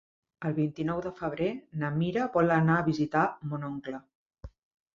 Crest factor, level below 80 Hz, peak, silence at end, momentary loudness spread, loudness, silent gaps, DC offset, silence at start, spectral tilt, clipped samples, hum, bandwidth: 18 dB; -58 dBFS; -12 dBFS; 0.45 s; 12 LU; -29 LUFS; 4.15-4.30 s; under 0.1%; 0.4 s; -8.5 dB/octave; under 0.1%; none; 7.2 kHz